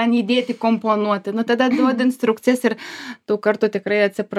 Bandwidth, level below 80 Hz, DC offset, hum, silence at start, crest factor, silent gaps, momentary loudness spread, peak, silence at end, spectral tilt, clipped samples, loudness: 13.5 kHz; -76 dBFS; under 0.1%; none; 0 s; 16 dB; none; 6 LU; -2 dBFS; 0 s; -5.5 dB/octave; under 0.1%; -19 LUFS